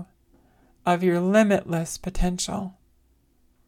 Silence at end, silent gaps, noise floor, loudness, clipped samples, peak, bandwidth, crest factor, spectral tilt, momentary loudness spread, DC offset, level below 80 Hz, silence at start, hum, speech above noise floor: 0.95 s; none; -63 dBFS; -24 LUFS; under 0.1%; -6 dBFS; 16 kHz; 20 dB; -5.5 dB/octave; 12 LU; under 0.1%; -38 dBFS; 0 s; none; 40 dB